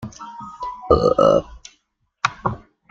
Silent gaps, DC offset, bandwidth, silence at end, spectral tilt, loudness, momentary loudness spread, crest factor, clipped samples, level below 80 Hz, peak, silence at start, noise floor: none; under 0.1%; 7.8 kHz; 0.35 s; -6 dB/octave; -19 LUFS; 20 LU; 20 dB; under 0.1%; -40 dBFS; -2 dBFS; 0 s; -67 dBFS